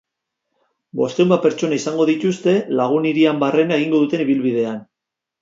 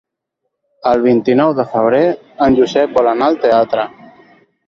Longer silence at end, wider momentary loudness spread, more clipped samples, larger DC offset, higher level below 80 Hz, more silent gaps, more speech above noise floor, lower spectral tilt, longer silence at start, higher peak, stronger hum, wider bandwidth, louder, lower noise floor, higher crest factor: second, 0.6 s vs 0.8 s; about the same, 7 LU vs 5 LU; neither; neither; second, -68 dBFS vs -48 dBFS; neither; first, 66 dB vs 62 dB; about the same, -6 dB/octave vs -7 dB/octave; about the same, 0.95 s vs 0.85 s; about the same, -2 dBFS vs 0 dBFS; neither; about the same, 7.8 kHz vs 7.4 kHz; second, -18 LUFS vs -13 LUFS; first, -83 dBFS vs -74 dBFS; about the same, 16 dB vs 14 dB